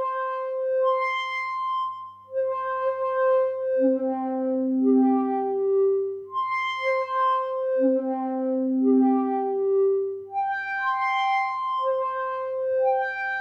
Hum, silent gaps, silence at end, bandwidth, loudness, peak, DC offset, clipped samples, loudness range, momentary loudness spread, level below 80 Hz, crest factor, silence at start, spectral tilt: none; none; 0 s; 6.6 kHz; -24 LUFS; -12 dBFS; under 0.1%; under 0.1%; 2 LU; 7 LU; -84 dBFS; 12 dB; 0 s; -5.5 dB/octave